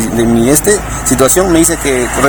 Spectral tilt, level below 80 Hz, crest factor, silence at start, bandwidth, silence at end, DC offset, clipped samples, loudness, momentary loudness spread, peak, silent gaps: -4 dB/octave; -26 dBFS; 10 dB; 0 s; 20 kHz; 0 s; under 0.1%; 0.3%; -9 LUFS; 5 LU; 0 dBFS; none